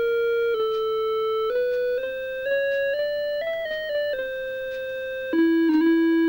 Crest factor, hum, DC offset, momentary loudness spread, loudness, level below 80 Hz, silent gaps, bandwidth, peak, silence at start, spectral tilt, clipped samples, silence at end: 12 dB; none; under 0.1%; 10 LU; -24 LUFS; -58 dBFS; none; 16.5 kHz; -10 dBFS; 0 s; -5.5 dB/octave; under 0.1%; 0 s